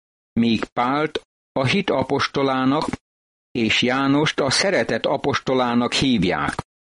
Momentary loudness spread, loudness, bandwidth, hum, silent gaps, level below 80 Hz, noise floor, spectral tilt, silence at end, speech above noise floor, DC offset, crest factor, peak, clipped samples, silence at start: 8 LU; -20 LUFS; 11.5 kHz; none; 0.72-0.76 s, 1.25-1.55 s, 3.01-3.55 s; -50 dBFS; under -90 dBFS; -4.5 dB/octave; 0.2 s; over 70 dB; under 0.1%; 14 dB; -6 dBFS; under 0.1%; 0.35 s